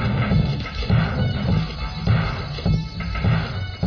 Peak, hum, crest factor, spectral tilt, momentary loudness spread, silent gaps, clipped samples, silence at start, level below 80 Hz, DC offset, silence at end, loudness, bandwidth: -8 dBFS; none; 14 dB; -8 dB/octave; 6 LU; none; under 0.1%; 0 s; -30 dBFS; under 0.1%; 0 s; -22 LUFS; 5.4 kHz